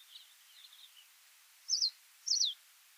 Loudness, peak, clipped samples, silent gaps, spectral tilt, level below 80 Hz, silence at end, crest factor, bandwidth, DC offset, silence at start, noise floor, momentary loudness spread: -33 LUFS; -20 dBFS; under 0.1%; none; 10.5 dB/octave; under -90 dBFS; 0.45 s; 20 dB; over 20 kHz; under 0.1%; 0.1 s; -63 dBFS; 25 LU